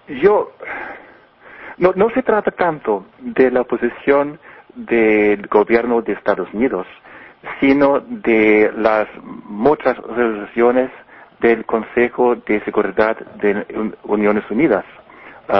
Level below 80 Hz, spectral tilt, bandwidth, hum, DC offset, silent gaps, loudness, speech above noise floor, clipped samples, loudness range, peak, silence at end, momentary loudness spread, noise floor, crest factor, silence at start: -50 dBFS; -9 dB/octave; 5.8 kHz; none; under 0.1%; none; -17 LUFS; 28 dB; under 0.1%; 2 LU; 0 dBFS; 0 s; 13 LU; -44 dBFS; 16 dB; 0.1 s